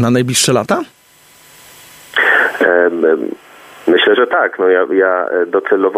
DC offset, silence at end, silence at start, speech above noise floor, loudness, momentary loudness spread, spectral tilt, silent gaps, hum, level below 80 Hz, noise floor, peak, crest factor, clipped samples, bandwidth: under 0.1%; 0 s; 0 s; 33 dB; -13 LUFS; 8 LU; -4 dB/octave; none; none; -60 dBFS; -46 dBFS; 0 dBFS; 14 dB; under 0.1%; 15.5 kHz